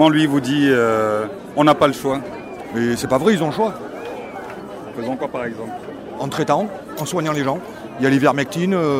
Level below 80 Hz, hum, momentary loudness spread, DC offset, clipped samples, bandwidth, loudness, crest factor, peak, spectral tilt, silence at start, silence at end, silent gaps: -54 dBFS; none; 16 LU; under 0.1%; under 0.1%; 16 kHz; -19 LUFS; 18 dB; -2 dBFS; -5.5 dB/octave; 0 s; 0 s; none